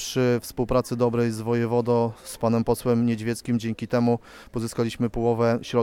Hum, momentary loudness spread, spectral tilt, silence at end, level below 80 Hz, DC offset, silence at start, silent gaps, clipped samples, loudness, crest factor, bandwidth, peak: none; 6 LU; -6.5 dB/octave; 0 s; -46 dBFS; under 0.1%; 0 s; none; under 0.1%; -24 LUFS; 14 dB; 16 kHz; -10 dBFS